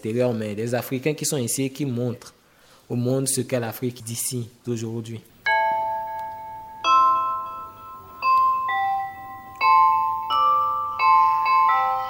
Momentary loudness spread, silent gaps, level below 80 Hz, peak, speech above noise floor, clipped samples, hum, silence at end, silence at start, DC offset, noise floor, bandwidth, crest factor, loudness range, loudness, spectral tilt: 17 LU; none; -64 dBFS; -6 dBFS; 29 dB; under 0.1%; none; 0 s; 0.05 s; under 0.1%; -54 dBFS; 17 kHz; 16 dB; 7 LU; -22 LUFS; -4 dB/octave